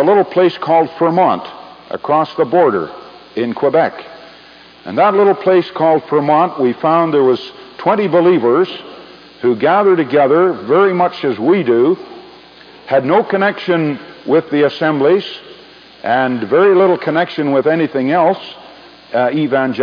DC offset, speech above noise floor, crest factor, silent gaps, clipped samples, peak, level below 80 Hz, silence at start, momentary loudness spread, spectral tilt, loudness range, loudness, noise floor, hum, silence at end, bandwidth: under 0.1%; 28 dB; 14 dB; none; under 0.1%; 0 dBFS; -64 dBFS; 0 s; 14 LU; -8.5 dB/octave; 3 LU; -13 LUFS; -40 dBFS; none; 0 s; 5.2 kHz